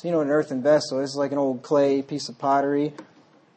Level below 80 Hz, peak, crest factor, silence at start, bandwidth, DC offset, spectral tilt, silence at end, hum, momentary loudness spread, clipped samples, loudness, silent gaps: -76 dBFS; -8 dBFS; 16 dB; 0.05 s; 8.8 kHz; under 0.1%; -5.5 dB/octave; 0.55 s; none; 6 LU; under 0.1%; -23 LUFS; none